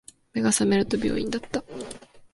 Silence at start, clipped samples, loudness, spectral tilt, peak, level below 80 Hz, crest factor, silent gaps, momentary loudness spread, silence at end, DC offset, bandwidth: 0.35 s; under 0.1%; -25 LUFS; -4 dB/octave; -8 dBFS; -52 dBFS; 18 dB; none; 17 LU; 0.1 s; under 0.1%; 11.5 kHz